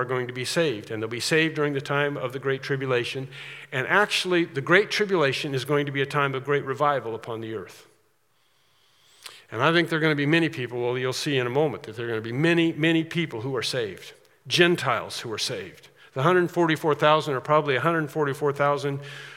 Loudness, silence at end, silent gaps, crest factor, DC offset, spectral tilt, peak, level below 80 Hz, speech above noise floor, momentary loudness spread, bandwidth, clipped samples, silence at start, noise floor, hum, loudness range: -24 LUFS; 0 s; none; 22 dB; under 0.1%; -5 dB/octave; -2 dBFS; -76 dBFS; 43 dB; 13 LU; 16 kHz; under 0.1%; 0 s; -68 dBFS; none; 5 LU